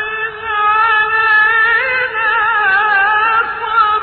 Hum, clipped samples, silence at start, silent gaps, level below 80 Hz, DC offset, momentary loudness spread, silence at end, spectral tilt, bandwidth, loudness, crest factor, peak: none; under 0.1%; 0 s; none; -48 dBFS; under 0.1%; 6 LU; 0 s; 2.5 dB/octave; 4.6 kHz; -12 LUFS; 12 dB; -2 dBFS